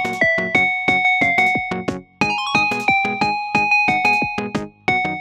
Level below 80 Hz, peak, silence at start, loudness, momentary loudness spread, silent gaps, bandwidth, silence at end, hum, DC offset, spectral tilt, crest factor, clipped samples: -52 dBFS; -4 dBFS; 0 s; -17 LUFS; 9 LU; none; 15 kHz; 0 s; none; under 0.1%; -4 dB/octave; 16 dB; under 0.1%